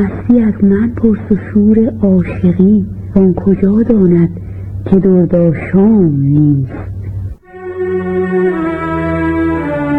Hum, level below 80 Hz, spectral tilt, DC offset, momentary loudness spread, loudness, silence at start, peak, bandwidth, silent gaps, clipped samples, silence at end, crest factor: none; -32 dBFS; -11.5 dB/octave; 0.2%; 14 LU; -11 LUFS; 0 s; 0 dBFS; 3.8 kHz; none; under 0.1%; 0 s; 10 dB